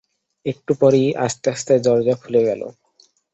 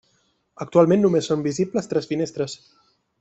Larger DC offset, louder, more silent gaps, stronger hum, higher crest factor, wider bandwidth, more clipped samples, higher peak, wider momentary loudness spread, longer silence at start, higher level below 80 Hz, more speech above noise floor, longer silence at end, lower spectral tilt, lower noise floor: neither; first, -18 LUFS vs -21 LUFS; neither; neither; about the same, 16 dB vs 20 dB; about the same, 8.2 kHz vs 8.2 kHz; neither; about the same, -2 dBFS vs -2 dBFS; about the same, 13 LU vs 13 LU; second, 0.45 s vs 0.6 s; about the same, -60 dBFS vs -64 dBFS; second, 40 dB vs 45 dB; about the same, 0.65 s vs 0.65 s; about the same, -6 dB/octave vs -6.5 dB/octave; second, -58 dBFS vs -66 dBFS